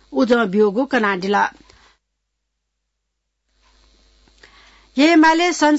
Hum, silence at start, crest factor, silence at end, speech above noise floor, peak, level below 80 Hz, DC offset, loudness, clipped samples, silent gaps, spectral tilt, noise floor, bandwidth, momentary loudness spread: 60 Hz at -65 dBFS; 0.1 s; 16 dB; 0 s; 60 dB; -4 dBFS; -56 dBFS; under 0.1%; -16 LUFS; under 0.1%; none; -4.5 dB/octave; -76 dBFS; 8 kHz; 7 LU